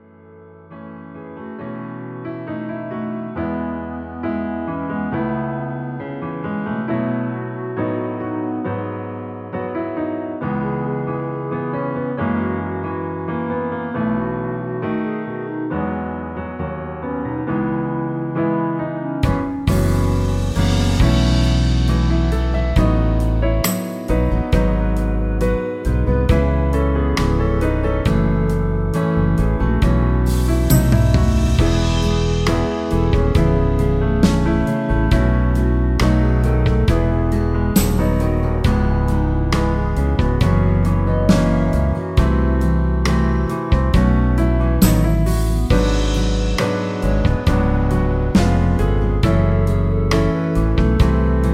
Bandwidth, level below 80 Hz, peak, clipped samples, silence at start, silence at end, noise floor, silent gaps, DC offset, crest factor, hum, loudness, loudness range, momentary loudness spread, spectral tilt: 15.5 kHz; -22 dBFS; 0 dBFS; under 0.1%; 0.35 s; 0 s; -43 dBFS; none; under 0.1%; 16 dB; none; -19 LUFS; 7 LU; 10 LU; -7 dB/octave